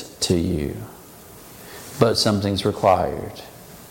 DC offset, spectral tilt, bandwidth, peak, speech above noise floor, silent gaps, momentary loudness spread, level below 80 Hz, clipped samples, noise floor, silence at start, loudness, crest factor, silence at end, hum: under 0.1%; -5 dB/octave; 17 kHz; -2 dBFS; 23 dB; none; 23 LU; -44 dBFS; under 0.1%; -43 dBFS; 0 s; -21 LUFS; 22 dB; 0 s; none